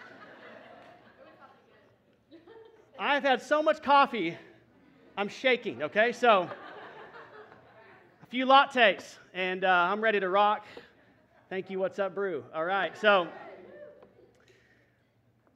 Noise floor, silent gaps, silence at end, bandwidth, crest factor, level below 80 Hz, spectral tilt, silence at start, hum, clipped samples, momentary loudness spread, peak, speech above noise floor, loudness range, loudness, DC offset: -68 dBFS; none; 1.65 s; 11.5 kHz; 22 dB; -80 dBFS; -4.5 dB/octave; 0.05 s; none; under 0.1%; 25 LU; -8 dBFS; 41 dB; 6 LU; -27 LUFS; under 0.1%